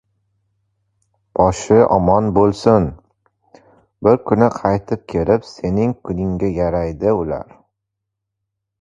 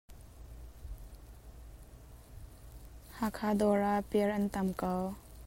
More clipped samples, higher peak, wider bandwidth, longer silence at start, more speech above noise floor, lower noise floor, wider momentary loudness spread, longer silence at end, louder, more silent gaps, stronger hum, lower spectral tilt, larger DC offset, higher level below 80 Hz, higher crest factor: neither; first, 0 dBFS vs -18 dBFS; second, 9.4 kHz vs 16 kHz; first, 1.35 s vs 0.1 s; first, 63 dB vs 21 dB; first, -79 dBFS vs -53 dBFS; second, 9 LU vs 24 LU; first, 1.4 s vs 0 s; first, -17 LUFS vs -33 LUFS; neither; neither; about the same, -7.5 dB/octave vs -7 dB/octave; neither; first, -38 dBFS vs -52 dBFS; about the same, 18 dB vs 18 dB